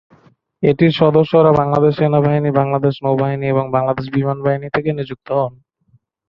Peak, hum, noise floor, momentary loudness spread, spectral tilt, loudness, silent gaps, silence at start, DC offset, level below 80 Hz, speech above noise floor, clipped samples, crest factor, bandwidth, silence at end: 0 dBFS; none; -57 dBFS; 8 LU; -10 dB/octave; -16 LUFS; none; 0.6 s; under 0.1%; -50 dBFS; 42 dB; under 0.1%; 16 dB; 5.8 kHz; 0.8 s